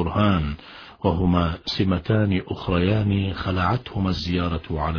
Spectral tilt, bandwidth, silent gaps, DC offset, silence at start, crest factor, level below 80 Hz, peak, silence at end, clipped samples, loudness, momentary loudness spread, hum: -8 dB/octave; 5.4 kHz; none; under 0.1%; 0 s; 18 dB; -38 dBFS; -6 dBFS; 0 s; under 0.1%; -23 LUFS; 6 LU; none